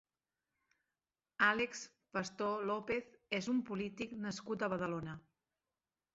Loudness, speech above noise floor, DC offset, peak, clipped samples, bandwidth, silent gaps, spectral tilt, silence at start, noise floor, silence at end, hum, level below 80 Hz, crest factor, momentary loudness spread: -38 LUFS; over 52 dB; under 0.1%; -18 dBFS; under 0.1%; 7.6 kHz; none; -3.5 dB/octave; 1.4 s; under -90 dBFS; 0.95 s; none; -74 dBFS; 24 dB; 12 LU